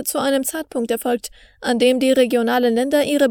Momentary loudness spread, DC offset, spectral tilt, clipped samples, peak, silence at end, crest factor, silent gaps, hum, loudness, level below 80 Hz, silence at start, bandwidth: 9 LU; under 0.1%; -3 dB/octave; under 0.1%; -4 dBFS; 0 s; 14 dB; none; none; -18 LUFS; -56 dBFS; 0 s; 20 kHz